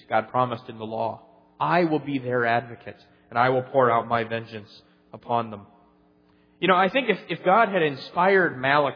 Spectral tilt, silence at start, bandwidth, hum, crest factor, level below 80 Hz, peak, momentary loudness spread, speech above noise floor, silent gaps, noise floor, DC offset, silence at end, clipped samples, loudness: -8 dB/octave; 0.1 s; 5.4 kHz; none; 20 dB; -70 dBFS; -4 dBFS; 16 LU; 36 dB; none; -60 dBFS; under 0.1%; 0 s; under 0.1%; -23 LUFS